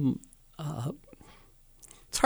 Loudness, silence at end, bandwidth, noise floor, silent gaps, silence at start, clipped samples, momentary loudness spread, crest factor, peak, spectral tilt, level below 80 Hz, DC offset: -37 LUFS; 0 s; over 20 kHz; -57 dBFS; none; 0 s; under 0.1%; 20 LU; 28 dB; -6 dBFS; -5 dB/octave; -56 dBFS; under 0.1%